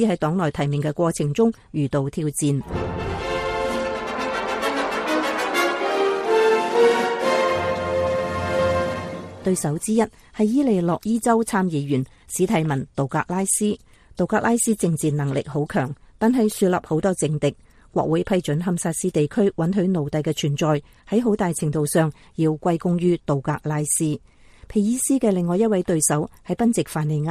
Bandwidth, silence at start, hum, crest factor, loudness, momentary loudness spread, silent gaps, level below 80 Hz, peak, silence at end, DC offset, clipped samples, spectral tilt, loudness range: 15 kHz; 0 s; none; 16 dB; -22 LUFS; 6 LU; none; -48 dBFS; -6 dBFS; 0 s; under 0.1%; under 0.1%; -5.5 dB/octave; 3 LU